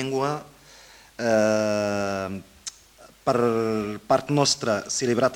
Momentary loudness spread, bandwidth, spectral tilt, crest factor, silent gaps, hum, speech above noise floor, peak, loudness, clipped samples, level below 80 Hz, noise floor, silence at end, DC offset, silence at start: 14 LU; 17 kHz; -4 dB/octave; 18 dB; none; none; 28 dB; -6 dBFS; -24 LUFS; under 0.1%; -60 dBFS; -52 dBFS; 0 s; under 0.1%; 0 s